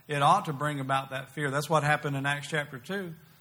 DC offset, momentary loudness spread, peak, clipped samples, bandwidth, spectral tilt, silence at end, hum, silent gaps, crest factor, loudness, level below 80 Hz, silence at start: under 0.1%; 12 LU; -10 dBFS; under 0.1%; 19.5 kHz; -5 dB/octave; 0.25 s; none; none; 18 dB; -29 LUFS; -68 dBFS; 0.1 s